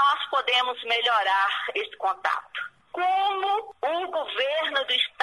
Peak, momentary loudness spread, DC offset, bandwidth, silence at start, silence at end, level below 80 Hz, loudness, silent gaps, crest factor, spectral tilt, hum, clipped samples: -8 dBFS; 7 LU; under 0.1%; 11.5 kHz; 0 s; 0 s; -74 dBFS; -25 LUFS; none; 16 dB; -0.5 dB/octave; none; under 0.1%